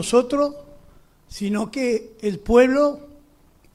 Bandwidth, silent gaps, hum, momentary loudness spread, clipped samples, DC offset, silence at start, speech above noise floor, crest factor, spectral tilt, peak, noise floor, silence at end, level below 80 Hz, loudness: 13 kHz; none; none; 13 LU; under 0.1%; under 0.1%; 0 s; 35 dB; 18 dB; -5 dB/octave; -2 dBFS; -55 dBFS; 0.7 s; -42 dBFS; -21 LUFS